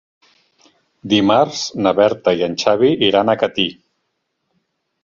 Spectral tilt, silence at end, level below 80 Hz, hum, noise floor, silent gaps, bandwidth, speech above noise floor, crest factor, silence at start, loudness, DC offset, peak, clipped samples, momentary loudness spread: -4.5 dB/octave; 1.3 s; -56 dBFS; none; -72 dBFS; none; 7.6 kHz; 57 dB; 16 dB; 1.05 s; -16 LUFS; under 0.1%; -2 dBFS; under 0.1%; 6 LU